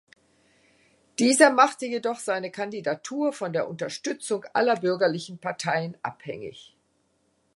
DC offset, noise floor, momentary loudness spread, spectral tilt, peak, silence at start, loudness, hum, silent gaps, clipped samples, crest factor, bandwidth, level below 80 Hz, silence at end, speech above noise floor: under 0.1%; -69 dBFS; 17 LU; -3.5 dB/octave; -2 dBFS; 1.2 s; -25 LUFS; none; none; under 0.1%; 24 dB; 11.5 kHz; -74 dBFS; 0.95 s; 44 dB